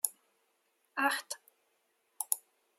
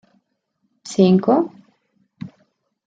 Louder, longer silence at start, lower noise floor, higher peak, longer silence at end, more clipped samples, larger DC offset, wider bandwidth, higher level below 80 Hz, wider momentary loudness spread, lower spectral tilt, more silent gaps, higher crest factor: second, -35 LUFS vs -17 LUFS; second, 0.05 s vs 0.85 s; first, -77 dBFS vs -71 dBFS; second, -8 dBFS vs -2 dBFS; second, 0.4 s vs 0.6 s; neither; neither; first, 16 kHz vs 7.8 kHz; second, under -90 dBFS vs -66 dBFS; second, 12 LU vs 23 LU; second, 1.5 dB/octave vs -7.5 dB/octave; neither; first, 32 dB vs 20 dB